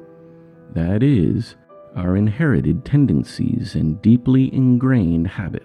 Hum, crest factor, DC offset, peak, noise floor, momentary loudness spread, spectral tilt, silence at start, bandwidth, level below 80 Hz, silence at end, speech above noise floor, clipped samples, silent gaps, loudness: none; 14 dB; under 0.1%; -4 dBFS; -44 dBFS; 9 LU; -9 dB/octave; 0 s; 10.5 kHz; -40 dBFS; 0.05 s; 27 dB; under 0.1%; none; -18 LUFS